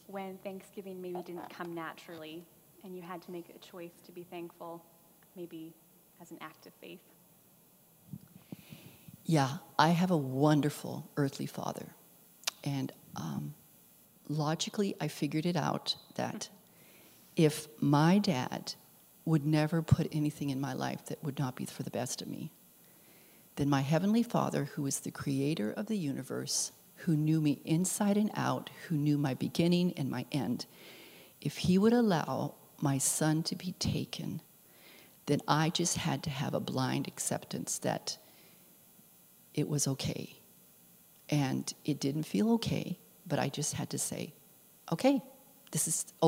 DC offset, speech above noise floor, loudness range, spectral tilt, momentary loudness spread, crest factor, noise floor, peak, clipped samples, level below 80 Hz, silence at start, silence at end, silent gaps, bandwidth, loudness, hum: under 0.1%; 30 dB; 16 LU; -5 dB/octave; 19 LU; 26 dB; -63 dBFS; -8 dBFS; under 0.1%; -66 dBFS; 0.1 s; 0 s; none; 16 kHz; -33 LUFS; none